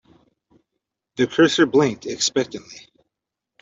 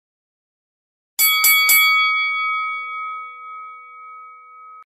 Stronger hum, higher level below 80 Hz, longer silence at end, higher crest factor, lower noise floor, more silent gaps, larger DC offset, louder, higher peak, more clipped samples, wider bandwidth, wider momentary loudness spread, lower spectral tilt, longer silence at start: neither; first, -62 dBFS vs -76 dBFS; first, 0.85 s vs 0.05 s; about the same, 18 dB vs 18 dB; first, -84 dBFS vs -42 dBFS; neither; neither; second, -19 LUFS vs -14 LUFS; about the same, -4 dBFS vs -2 dBFS; neither; second, 8 kHz vs 15.5 kHz; about the same, 21 LU vs 23 LU; first, -4 dB/octave vs 5 dB/octave; about the same, 1.2 s vs 1.2 s